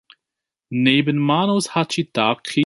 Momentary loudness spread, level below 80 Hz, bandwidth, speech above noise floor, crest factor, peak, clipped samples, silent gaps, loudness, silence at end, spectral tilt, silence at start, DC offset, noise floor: 5 LU; -64 dBFS; 11.5 kHz; 67 dB; 18 dB; -2 dBFS; under 0.1%; none; -19 LUFS; 0 s; -5 dB/octave; 0.7 s; under 0.1%; -85 dBFS